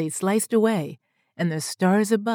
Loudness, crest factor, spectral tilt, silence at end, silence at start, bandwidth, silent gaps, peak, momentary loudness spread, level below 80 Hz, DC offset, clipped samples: -23 LUFS; 16 dB; -5.5 dB/octave; 0 s; 0 s; 19 kHz; none; -8 dBFS; 8 LU; -80 dBFS; under 0.1%; under 0.1%